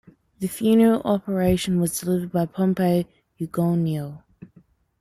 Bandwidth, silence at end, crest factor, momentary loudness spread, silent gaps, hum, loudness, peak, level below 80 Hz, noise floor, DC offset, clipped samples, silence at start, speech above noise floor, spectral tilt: 15 kHz; 0.55 s; 16 dB; 13 LU; none; none; -22 LUFS; -8 dBFS; -50 dBFS; -57 dBFS; under 0.1%; under 0.1%; 0.4 s; 35 dB; -6.5 dB/octave